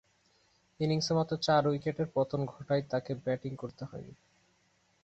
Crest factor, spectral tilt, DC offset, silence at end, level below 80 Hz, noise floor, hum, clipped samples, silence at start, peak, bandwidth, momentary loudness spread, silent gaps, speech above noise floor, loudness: 20 dB; -6 dB/octave; under 0.1%; 0.9 s; -66 dBFS; -71 dBFS; none; under 0.1%; 0.8 s; -14 dBFS; 8.2 kHz; 16 LU; none; 39 dB; -32 LUFS